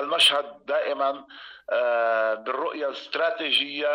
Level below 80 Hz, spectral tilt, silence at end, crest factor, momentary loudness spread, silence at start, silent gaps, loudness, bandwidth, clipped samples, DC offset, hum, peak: -74 dBFS; -0.5 dB/octave; 0 s; 14 dB; 11 LU; 0 s; none; -24 LUFS; 16 kHz; under 0.1%; under 0.1%; none; -10 dBFS